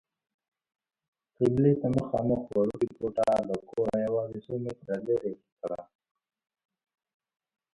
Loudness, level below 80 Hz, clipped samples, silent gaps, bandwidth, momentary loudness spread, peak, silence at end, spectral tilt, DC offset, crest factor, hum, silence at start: -29 LUFS; -58 dBFS; under 0.1%; 5.52-5.57 s; 11.5 kHz; 13 LU; -12 dBFS; 1.9 s; -9 dB/octave; under 0.1%; 18 dB; none; 1.4 s